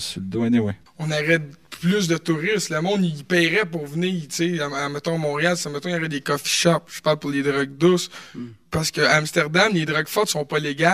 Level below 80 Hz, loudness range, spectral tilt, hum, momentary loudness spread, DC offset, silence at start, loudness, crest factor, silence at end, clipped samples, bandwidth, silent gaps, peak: -58 dBFS; 2 LU; -4.5 dB/octave; none; 8 LU; 0.1%; 0 s; -21 LUFS; 22 dB; 0 s; under 0.1%; 15.5 kHz; none; 0 dBFS